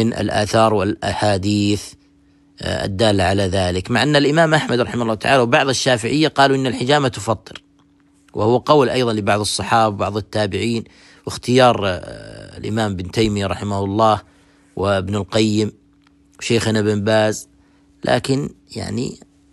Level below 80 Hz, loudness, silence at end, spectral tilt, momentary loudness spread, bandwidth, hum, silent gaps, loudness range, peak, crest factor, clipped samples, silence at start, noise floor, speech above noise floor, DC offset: -46 dBFS; -18 LUFS; 0.35 s; -5 dB/octave; 13 LU; 12.5 kHz; none; none; 4 LU; -2 dBFS; 18 dB; under 0.1%; 0 s; -54 dBFS; 37 dB; under 0.1%